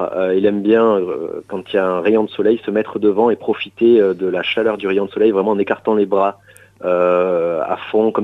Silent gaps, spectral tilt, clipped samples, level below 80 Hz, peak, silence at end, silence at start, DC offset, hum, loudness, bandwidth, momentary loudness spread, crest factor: none; -7.5 dB/octave; under 0.1%; -60 dBFS; -2 dBFS; 0 s; 0 s; under 0.1%; none; -16 LUFS; 5.4 kHz; 7 LU; 14 dB